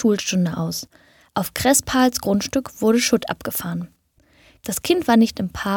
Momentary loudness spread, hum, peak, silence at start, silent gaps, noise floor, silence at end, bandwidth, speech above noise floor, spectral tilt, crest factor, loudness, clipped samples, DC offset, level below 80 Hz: 13 LU; none; -2 dBFS; 0 s; none; -58 dBFS; 0 s; 19.5 kHz; 38 dB; -4 dB/octave; 18 dB; -20 LUFS; under 0.1%; under 0.1%; -48 dBFS